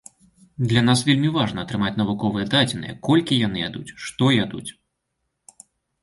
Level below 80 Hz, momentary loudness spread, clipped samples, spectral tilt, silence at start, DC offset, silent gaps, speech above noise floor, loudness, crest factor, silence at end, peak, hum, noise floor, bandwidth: -52 dBFS; 12 LU; under 0.1%; -5.5 dB/octave; 0.6 s; under 0.1%; none; 56 dB; -21 LUFS; 18 dB; 1.3 s; -4 dBFS; none; -76 dBFS; 11.5 kHz